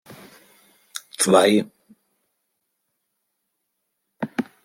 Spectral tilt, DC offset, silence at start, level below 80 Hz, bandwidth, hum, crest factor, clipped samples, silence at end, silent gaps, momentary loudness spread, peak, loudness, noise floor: -3.5 dB/octave; under 0.1%; 0.1 s; -74 dBFS; 16.5 kHz; none; 24 dB; under 0.1%; 0.25 s; none; 21 LU; -2 dBFS; -19 LUFS; -77 dBFS